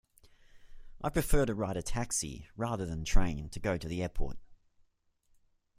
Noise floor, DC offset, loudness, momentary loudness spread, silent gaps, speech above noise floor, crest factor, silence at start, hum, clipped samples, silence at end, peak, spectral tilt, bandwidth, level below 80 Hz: -72 dBFS; under 0.1%; -35 LUFS; 9 LU; none; 42 dB; 20 dB; 0.55 s; none; under 0.1%; 1.25 s; -12 dBFS; -5 dB/octave; 16 kHz; -38 dBFS